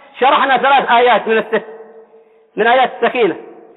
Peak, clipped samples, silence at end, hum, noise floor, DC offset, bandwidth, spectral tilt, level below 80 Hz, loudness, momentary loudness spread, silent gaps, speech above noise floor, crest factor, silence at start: -2 dBFS; under 0.1%; 0.25 s; none; -47 dBFS; under 0.1%; 4.2 kHz; -7 dB/octave; -64 dBFS; -13 LUFS; 10 LU; none; 35 dB; 12 dB; 0.15 s